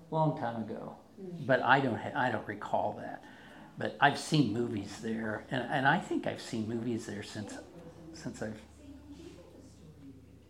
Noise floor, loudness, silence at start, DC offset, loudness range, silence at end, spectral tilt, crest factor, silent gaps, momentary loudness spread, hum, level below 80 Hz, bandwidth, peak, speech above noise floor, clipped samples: -54 dBFS; -33 LUFS; 0 s; under 0.1%; 10 LU; 0.1 s; -5.5 dB/octave; 26 dB; none; 23 LU; none; -66 dBFS; 15.5 kHz; -8 dBFS; 21 dB; under 0.1%